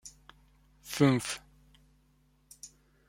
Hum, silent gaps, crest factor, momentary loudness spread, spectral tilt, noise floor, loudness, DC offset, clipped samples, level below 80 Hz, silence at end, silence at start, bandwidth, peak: none; none; 24 dB; 24 LU; -5.5 dB/octave; -67 dBFS; -30 LUFS; under 0.1%; under 0.1%; -64 dBFS; 0.4 s; 0.05 s; 16.5 kHz; -10 dBFS